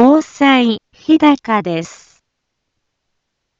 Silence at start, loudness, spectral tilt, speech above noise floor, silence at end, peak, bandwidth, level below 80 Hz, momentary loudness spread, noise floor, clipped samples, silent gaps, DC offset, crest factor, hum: 0 s; -13 LUFS; -5.5 dB/octave; 59 dB; 1.7 s; 0 dBFS; 7.6 kHz; -58 dBFS; 12 LU; -73 dBFS; under 0.1%; none; under 0.1%; 14 dB; none